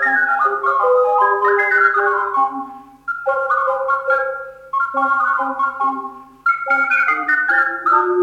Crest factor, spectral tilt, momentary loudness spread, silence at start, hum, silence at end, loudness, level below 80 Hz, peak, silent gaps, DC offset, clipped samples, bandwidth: 16 dB; -4.5 dB/octave; 10 LU; 0 s; none; 0 s; -16 LUFS; -62 dBFS; -2 dBFS; none; under 0.1%; under 0.1%; 10 kHz